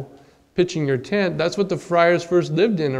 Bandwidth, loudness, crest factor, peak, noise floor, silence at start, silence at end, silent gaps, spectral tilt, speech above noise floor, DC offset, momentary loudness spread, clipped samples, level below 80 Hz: 11 kHz; -20 LUFS; 18 dB; -2 dBFS; -49 dBFS; 0 s; 0 s; none; -6 dB/octave; 30 dB; under 0.1%; 7 LU; under 0.1%; -56 dBFS